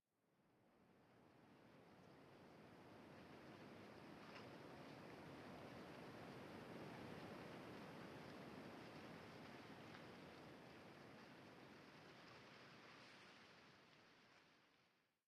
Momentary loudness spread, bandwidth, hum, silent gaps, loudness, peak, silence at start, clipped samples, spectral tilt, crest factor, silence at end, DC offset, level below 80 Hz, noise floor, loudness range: 10 LU; 13.5 kHz; none; none; -61 LUFS; -44 dBFS; 0.25 s; under 0.1%; -5.5 dB/octave; 18 dB; 0.2 s; under 0.1%; -88 dBFS; -83 dBFS; 7 LU